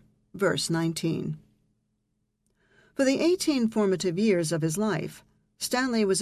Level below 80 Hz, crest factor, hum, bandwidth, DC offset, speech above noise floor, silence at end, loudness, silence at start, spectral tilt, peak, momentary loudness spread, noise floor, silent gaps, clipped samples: -64 dBFS; 16 dB; none; 14.5 kHz; under 0.1%; 50 dB; 0 s; -26 LUFS; 0.35 s; -4.5 dB/octave; -12 dBFS; 10 LU; -76 dBFS; none; under 0.1%